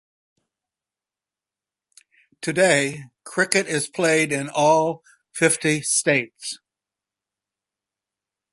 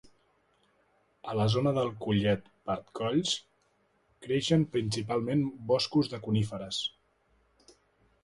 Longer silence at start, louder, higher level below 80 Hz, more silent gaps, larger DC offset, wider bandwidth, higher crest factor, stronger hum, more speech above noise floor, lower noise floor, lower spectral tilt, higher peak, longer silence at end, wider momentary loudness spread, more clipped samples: first, 2.4 s vs 1.25 s; first, -20 LUFS vs -30 LUFS; second, -68 dBFS vs -60 dBFS; neither; neither; about the same, 12 kHz vs 11.5 kHz; first, 24 dB vs 18 dB; neither; first, over 69 dB vs 41 dB; first, under -90 dBFS vs -71 dBFS; second, -3 dB/octave vs -6 dB/octave; first, 0 dBFS vs -14 dBFS; first, 1.95 s vs 1.35 s; first, 15 LU vs 9 LU; neither